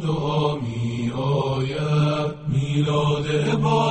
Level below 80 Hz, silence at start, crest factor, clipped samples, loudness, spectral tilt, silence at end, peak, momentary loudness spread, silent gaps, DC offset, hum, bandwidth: -46 dBFS; 0 s; 16 dB; under 0.1%; -22 LUFS; -7 dB/octave; 0 s; -6 dBFS; 5 LU; none; under 0.1%; none; 8.6 kHz